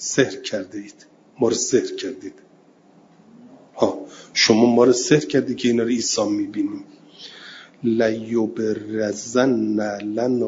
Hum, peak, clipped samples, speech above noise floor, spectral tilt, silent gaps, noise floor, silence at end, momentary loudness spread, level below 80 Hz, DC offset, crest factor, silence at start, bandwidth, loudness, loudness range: none; -2 dBFS; under 0.1%; 32 dB; -4 dB/octave; none; -53 dBFS; 0 s; 21 LU; -64 dBFS; under 0.1%; 20 dB; 0 s; 7.8 kHz; -20 LUFS; 7 LU